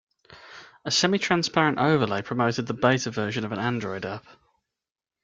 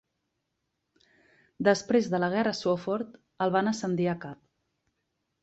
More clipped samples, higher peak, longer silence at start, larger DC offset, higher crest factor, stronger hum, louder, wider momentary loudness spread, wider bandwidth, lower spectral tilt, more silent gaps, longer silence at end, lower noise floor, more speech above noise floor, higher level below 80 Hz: neither; first, -6 dBFS vs -10 dBFS; second, 0.3 s vs 1.6 s; neither; about the same, 20 dB vs 20 dB; neither; first, -24 LUFS vs -28 LUFS; first, 16 LU vs 9 LU; first, 9.4 kHz vs 8.2 kHz; about the same, -4.5 dB/octave vs -5.5 dB/octave; neither; second, 0.9 s vs 1.1 s; second, -72 dBFS vs -81 dBFS; second, 47 dB vs 54 dB; first, -62 dBFS vs -70 dBFS